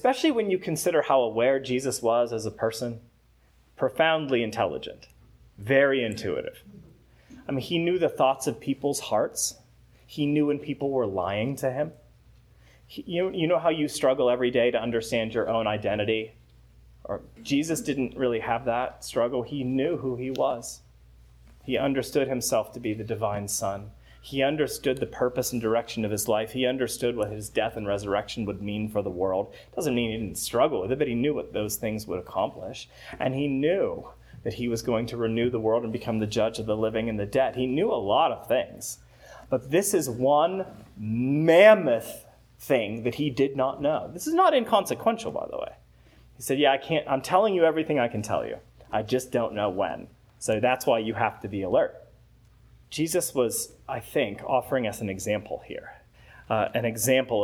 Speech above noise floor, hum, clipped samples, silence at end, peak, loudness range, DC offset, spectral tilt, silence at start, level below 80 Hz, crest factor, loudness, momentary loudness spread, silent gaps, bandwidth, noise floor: 34 dB; none; under 0.1%; 0 s; -2 dBFS; 6 LU; under 0.1%; -4.5 dB/octave; 0.05 s; -56 dBFS; 24 dB; -26 LUFS; 11 LU; none; 19.5 kHz; -60 dBFS